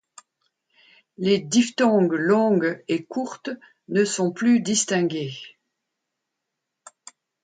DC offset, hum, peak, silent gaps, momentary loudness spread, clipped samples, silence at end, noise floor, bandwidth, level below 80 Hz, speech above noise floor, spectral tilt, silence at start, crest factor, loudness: under 0.1%; none; -8 dBFS; none; 14 LU; under 0.1%; 1.95 s; -82 dBFS; 9.4 kHz; -70 dBFS; 60 dB; -4.5 dB/octave; 1.2 s; 16 dB; -22 LUFS